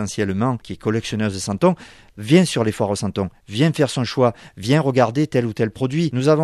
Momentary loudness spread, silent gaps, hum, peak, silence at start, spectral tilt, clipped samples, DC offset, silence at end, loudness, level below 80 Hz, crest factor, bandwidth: 9 LU; none; none; -2 dBFS; 0 s; -6 dB/octave; under 0.1%; under 0.1%; 0 s; -20 LUFS; -52 dBFS; 18 dB; 13.5 kHz